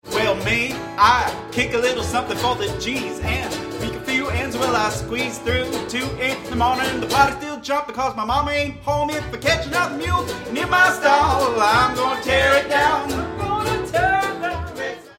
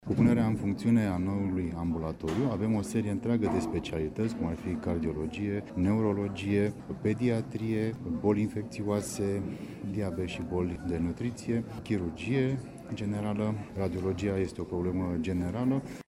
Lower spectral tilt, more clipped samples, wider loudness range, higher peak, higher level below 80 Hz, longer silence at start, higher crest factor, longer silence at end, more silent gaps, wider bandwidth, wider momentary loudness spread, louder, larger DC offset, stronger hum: second, -4 dB/octave vs -7.5 dB/octave; neither; about the same, 5 LU vs 3 LU; first, -2 dBFS vs -12 dBFS; first, -38 dBFS vs -52 dBFS; about the same, 0.05 s vs 0 s; about the same, 18 dB vs 18 dB; about the same, 0.05 s vs 0.05 s; neither; first, 16.5 kHz vs 14.5 kHz; first, 9 LU vs 6 LU; first, -20 LUFS vs -31 LUFS; neither; neither